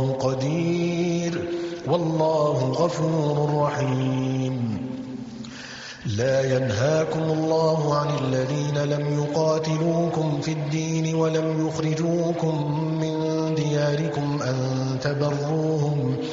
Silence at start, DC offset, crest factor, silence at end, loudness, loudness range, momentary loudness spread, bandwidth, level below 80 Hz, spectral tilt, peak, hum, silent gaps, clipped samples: 0 s; under 0.1%; 14 dB; 0 s; -24 LUFS; 2 LU; 6 LU; 7.8 kHz; -58 dBFS; -6.5 dB/octave; -8 dBFS; none; none; under 0.1%